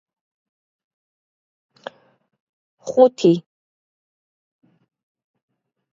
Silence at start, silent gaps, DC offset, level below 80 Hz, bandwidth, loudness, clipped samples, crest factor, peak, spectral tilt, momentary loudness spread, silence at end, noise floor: 2.85 s; none; under 0.1%; -74 dBFS; 7.6 kHz; -17 LUFS; under 0.1%; 24 dB; 0 dBFS; -7 dB/octave; 25 LU; 2.55 s; -41 dBFS